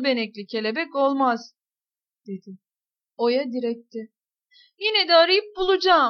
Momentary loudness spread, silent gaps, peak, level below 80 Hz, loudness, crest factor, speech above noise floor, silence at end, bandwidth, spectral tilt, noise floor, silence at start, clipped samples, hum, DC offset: 22 LU; none; -6 dBFS; -62 dBFS; -22 LUFS; 18 dB; over 68 dB; 0 s; 6.6 kHz; -4.5 dB/octave; under -90 dBFS; 0 s; under 0.1%; none; under 0.1%